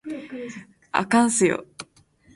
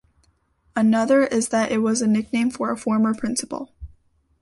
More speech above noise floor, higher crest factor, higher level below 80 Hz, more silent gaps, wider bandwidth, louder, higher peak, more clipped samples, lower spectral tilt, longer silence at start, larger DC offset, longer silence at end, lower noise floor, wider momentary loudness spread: second, 35 dB vs 43 dB; about the same, 20 dB vs 16 dB; second, -64 dBFS vs -52 dBFS; neither; about the same, 11.5 kHz vs 11.5 kHz; about the same, -22 LUFS vs -21 LUFS; about the same, -4 dBFS vs -6 dBFS; neither; about the same, -4 dB/octave vs -4.5 dB/octave; second, 0.05 s vs 0.75 s; neither; about the same, 0.55 s vs 0.55 s; second, -57 dBFS vs -63 dBFS; first, 22 LU vs 12 LU